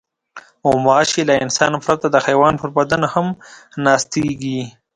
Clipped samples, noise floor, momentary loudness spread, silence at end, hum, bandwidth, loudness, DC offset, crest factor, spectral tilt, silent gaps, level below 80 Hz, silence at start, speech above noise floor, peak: under 0.1%; -42 dBFS; 10 LU; 0.25 s; none; 11 kHz; -16 LUFS; under 0.1%; 16 dB; -4.5 dB/octave; none; -50 dBFS; 0.35 s; 25 dB; 0 dBFS